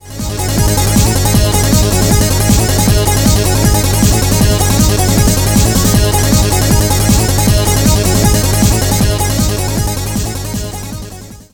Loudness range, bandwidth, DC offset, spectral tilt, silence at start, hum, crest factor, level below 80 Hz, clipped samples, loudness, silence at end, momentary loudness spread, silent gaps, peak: 2 LU; over 20 kHz; 0.3%; -4.5 dB/octave; 0.05 s; none; 10 dB; -18 dBFS; under 0.1%; -11 LUFS; 0.1 s; 8 LU; none; 0 dBFS